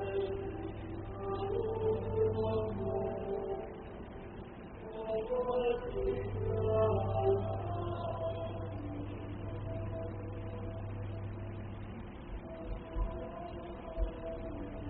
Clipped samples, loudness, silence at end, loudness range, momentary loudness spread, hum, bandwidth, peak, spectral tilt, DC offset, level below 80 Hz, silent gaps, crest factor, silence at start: under 0.1%; -38 LUFS; 0 s; 9 LU; 14 LU; none; 4 kHz; -18 dBFS; -7.5 dB/octave; under 0.1%; -46 dBFS; none; 18 dB; 0 s